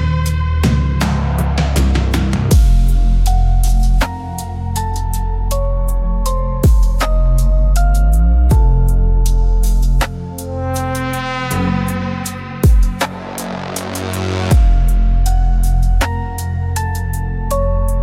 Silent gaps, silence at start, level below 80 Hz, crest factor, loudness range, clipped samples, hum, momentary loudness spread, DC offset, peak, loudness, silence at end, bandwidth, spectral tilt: none; 0 s; -14 dBFS; 10 dB; 4 LU; under 0.1%; none; 8 LU; under 0.1%; -2 dBFS; -16 LUFS; 0 s; 15.5 kHz; -6 dB/octave